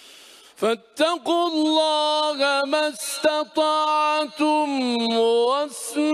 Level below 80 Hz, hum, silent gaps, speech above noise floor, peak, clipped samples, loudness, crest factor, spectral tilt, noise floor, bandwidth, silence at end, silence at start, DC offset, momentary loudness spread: -74 dBFS; none; none; 26 dB; -8 dBFS; under 0.1%; -21 LUFS; 14 dB; -2 dB/octave; -47 dBFS; 15.5 kHz; 0 s; 0.6 s; under 0.1%; 6 LU